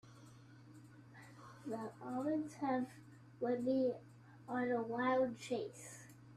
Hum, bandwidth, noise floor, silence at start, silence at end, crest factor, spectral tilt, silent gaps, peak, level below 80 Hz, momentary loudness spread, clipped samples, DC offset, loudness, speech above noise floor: none; 13.5 kHz; -60 dBFS; 0.05 s; 0 s; 16 dB; -6 dB/octave; none; -26 dBFS; -80 dBFS; 24 LU; under 0.1%; under 0.1%; -40 LUFS; 21 dB